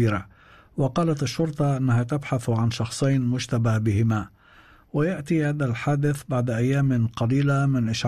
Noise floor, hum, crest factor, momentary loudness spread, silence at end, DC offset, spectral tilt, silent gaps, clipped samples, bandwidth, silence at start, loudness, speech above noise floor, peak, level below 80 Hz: -53 dBFS; none; 10 dB; 4 LU; 0 s; 0.1%; -7 dB/octave; none; under 0.1%; 13 kHz; 0 s; -24 LUFS; 30 dB; -12 dBFS; -52 dBFS